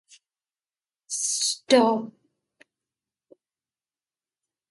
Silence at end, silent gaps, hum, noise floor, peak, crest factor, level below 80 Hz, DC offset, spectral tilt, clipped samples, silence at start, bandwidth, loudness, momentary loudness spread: 2.6 s; none; none; under -90 dBFS; -4 dBFS; 24 dB; -78 dBFS; under 0.1%; -2 dB/octave; under 0.1%; 1.1 s; 11.5 kHz; -23 LUFS; 13 LU